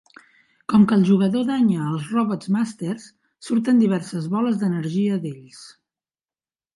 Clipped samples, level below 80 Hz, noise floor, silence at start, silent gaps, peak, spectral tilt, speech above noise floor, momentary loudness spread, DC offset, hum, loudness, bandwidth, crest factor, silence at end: under 0.1%; -64 dBFS; under -90 dBFS; 0.7 s; none; -4 dBFS; -7.5 dB/octave; over 70 dB; 14 LU; under 0.1%; none; -21 LUFS; 11.5 kHz; 16 dB; 1.05 s